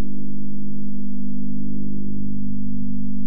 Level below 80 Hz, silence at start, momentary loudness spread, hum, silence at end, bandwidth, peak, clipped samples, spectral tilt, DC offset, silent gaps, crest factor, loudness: -44 dBFS; 0 s; 3 LU; 50 Hz at -30 dBFS; 0 s; 0.8 kHz; -10 dBFS; under 0.1%; -12.5 dB/octave; 30%; none; 8 dB; -30 LUFS